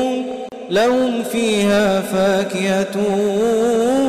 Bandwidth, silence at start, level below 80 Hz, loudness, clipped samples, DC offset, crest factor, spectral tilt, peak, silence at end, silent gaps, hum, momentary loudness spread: 16 kHz; 0 s; -52 dBFS; -17 LUFS; under 0.1%; under 0.1%; 6 dB; -5 dB/octave; -10 dBFS; 0 s; none; none; 6 LU